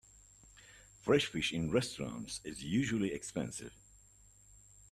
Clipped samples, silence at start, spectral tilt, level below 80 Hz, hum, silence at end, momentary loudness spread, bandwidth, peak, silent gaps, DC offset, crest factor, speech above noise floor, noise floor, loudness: under 0.1%; 0.55 s; -4.5 dB/octave; -62 dBFS; none; 0.1 s; 24 LU; 14 kHz; -16 dBFS; none; under 0.1%; 22 dB; 27 dB; -63 dBFS; -36 LUFS